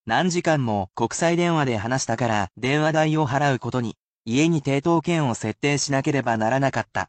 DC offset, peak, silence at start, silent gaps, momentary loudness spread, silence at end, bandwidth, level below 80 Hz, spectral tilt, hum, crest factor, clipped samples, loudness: under 0.1%; -8 dBFS; 0.05 s; 3.99-4.25 s; 5 LU; 0.05 s; 9 kHz; -56 dBFS; -5 dB/octave; none; 14 dB; under 0.1%; -22 LUFS